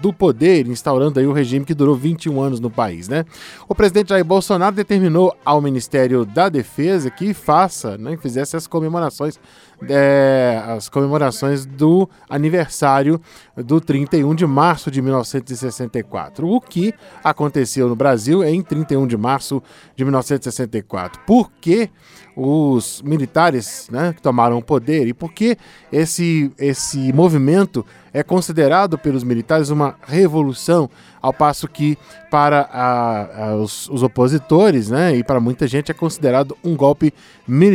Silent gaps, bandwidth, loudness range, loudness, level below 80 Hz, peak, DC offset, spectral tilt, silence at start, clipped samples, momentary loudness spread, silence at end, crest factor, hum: none; 16.5 kHz; 3 LU; -17 LUFS; -48 dBFS; 0 dBFS; under 0.1%; -6.5 dB/octave; 0 s; under 0.1%; 10 LU; 0 s; 16 dB; none